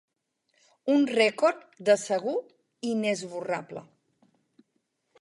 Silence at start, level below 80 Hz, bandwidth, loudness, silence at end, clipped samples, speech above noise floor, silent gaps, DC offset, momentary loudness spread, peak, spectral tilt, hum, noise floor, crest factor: 0.85 s; -82 dBFS; 11.5 kHz; -27 LUFS; 1.4 s; under 0.1%; 50 dB; none; under 0.1%; 13 LU; -8 dBFS; -4 dB/octave; none; -77 dBFS; 20 dB